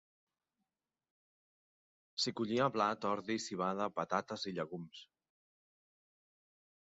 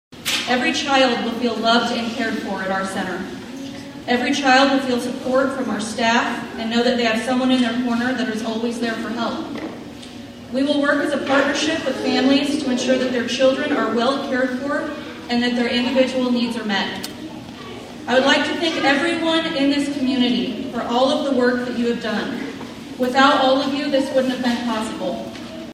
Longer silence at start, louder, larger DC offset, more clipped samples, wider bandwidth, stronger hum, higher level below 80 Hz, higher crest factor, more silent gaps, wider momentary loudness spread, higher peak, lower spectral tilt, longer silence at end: first, 2.15 s vs 0.1 s; second, -37 LUFS vs -19 LUFS; neither; neither; second, 7.6 kHz vs 15.5 kHz; neither; second, -80 dBFS vs -54 dBFS; about the same, 22 dB vs 20 dB; neither; about the same, 12 LU vs 14 LU; second, -18 dBFS vs 0 dBFS; about the same, -3.5 dB/octave vs -3.5 dB/octave; first, 1.8 s vs 0 s